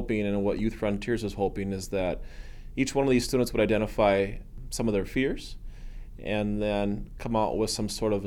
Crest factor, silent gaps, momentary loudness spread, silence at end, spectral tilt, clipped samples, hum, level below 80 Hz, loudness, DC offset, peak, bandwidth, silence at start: 18 dB; none; 16 LU; 0 s; -5.5 dB/octave; under 0.1%; none; -40 dBFS; -28 LUFS; under 0.1%; -10 dBFS; 17.5 kHz; 0 s